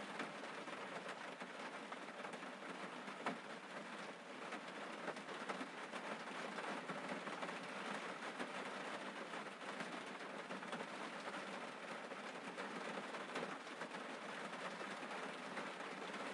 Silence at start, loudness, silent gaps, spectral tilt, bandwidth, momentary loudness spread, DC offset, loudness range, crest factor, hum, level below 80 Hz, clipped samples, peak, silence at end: 0 s; -48 LUFS; none; -3.5 dB/octave; 11.5 kHz; 3 LU; under 0.1%; 2 LU; 20 dB; none; under -90 dBFS; under 0.1%; -28 dBFS; 0 s